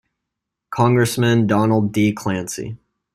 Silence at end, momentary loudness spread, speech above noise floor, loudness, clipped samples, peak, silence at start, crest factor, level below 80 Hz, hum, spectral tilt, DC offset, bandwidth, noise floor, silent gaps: 0.4 s; 13 LU; 64 dB; -18 LUFS; under 0.1%; -2 dBFS; 0.7 s; 16 dB; -54 dBFS; none; -6 dB/octave; under 0.1%; 15 kHz; -81 dBFS; none